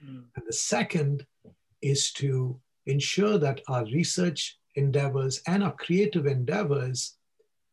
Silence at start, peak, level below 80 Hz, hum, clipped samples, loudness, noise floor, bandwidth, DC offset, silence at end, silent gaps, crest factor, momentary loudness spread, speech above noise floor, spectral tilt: 0 s; -12 dBFS; -66 dBFS; none; under 0.1%; -27 LUFS; -73 dBFS; 12 kHz; under 0.1%; 0.6 s; none; 16 dB; 9 LU; 46 dB; -5 dB/octave